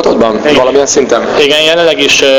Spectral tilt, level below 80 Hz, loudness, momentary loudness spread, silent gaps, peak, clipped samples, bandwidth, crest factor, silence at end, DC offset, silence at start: -2 dB/octave; -40 dBFS; -7 LUFS; 3 LU; none; 0 dBFS; 1%; 17 kHz; 8 dB; 0 s; under 0.1%; 0 s